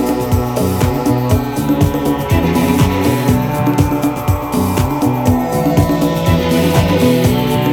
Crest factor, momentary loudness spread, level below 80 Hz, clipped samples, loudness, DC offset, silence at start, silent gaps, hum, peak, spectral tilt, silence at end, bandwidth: 14 dB; 4 LU; -28 dBFS; under 0.1%; -14 LUFS; under 0.1%; 0 s; none; none; 0 dBFS; -6.5 dB/octave; 0 s; 19 kHz